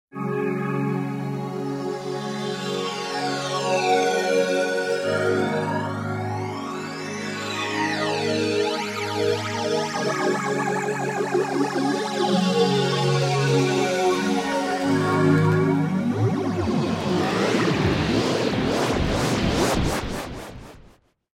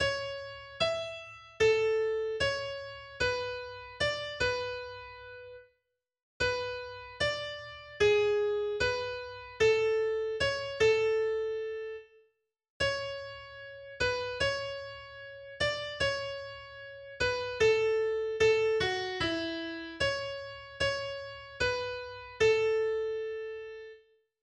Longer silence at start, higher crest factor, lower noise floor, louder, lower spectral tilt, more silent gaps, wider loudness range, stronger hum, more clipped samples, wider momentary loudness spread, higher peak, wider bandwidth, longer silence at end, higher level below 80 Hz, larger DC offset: first, 0.15 s vs 0 s; about the same, 16 dB vs 18 dB; second, -54 dBFS vs -82 dBFS; first, -23 LUFS vs -31 LUFS; first, -5.5 dB/octave vs -3.5 dB/octave; second, none vs 6.23-6.40 s, 12.70-12.80 s; about the same, 5 LU vs 6 LU; neither; neither; second, 8 LU vs 18 LU; first, -8 dBFS vs -16 dBFS; first, 16 kHz vs 9.8 kHz; about the same, 0.5 s vs 0.45 s; first, -44 dBFS vs -56 dBFS; neither